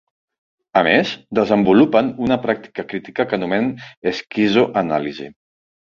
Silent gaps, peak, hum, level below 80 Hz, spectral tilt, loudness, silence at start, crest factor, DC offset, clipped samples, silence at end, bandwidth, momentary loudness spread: 3.97-4.02 s; -2 dBFS; none; -54 dBFS; -6.5 dB/octave; -18 LUFS; 0.75 s; 18 dB; under 0.1%; under 0.1%; 0.65 s; 7.2 kHz; 13 LU